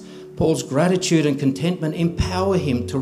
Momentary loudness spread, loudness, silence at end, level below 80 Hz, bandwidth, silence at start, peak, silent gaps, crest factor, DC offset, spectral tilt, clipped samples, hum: 5 LU; -20 LUFS; 0 s; -40 dBFS; 14.5 kHz; 0 s; -4 dBFS; none; 16 dB; under 0.1%; -6 dB/octave; under 0.1%; none